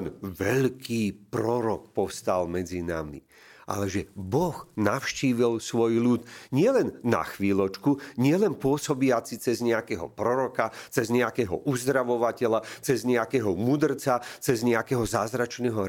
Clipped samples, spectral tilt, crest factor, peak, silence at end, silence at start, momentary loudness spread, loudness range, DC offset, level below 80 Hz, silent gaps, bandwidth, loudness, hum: under 0.1%; -6 dB/octave; 20 dB; -6 dBFS; 0 s; 0 s; 6 LU; 4 LU; under 0.1%; -56 dBFS; none; 17 kHz; -27 LUFS; none